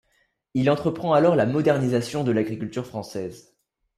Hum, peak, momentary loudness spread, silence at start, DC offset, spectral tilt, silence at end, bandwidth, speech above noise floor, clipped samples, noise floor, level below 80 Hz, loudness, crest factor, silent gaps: none; -6 dBFS; 13 LU; 0.55 s; under 0.1%; -7 dB/octave; 0.55 s; 14.5 kHz; 46 dB; under 0.1%; -68 dBFS; -60 dBFS; -23 LUFS; 18 dB; none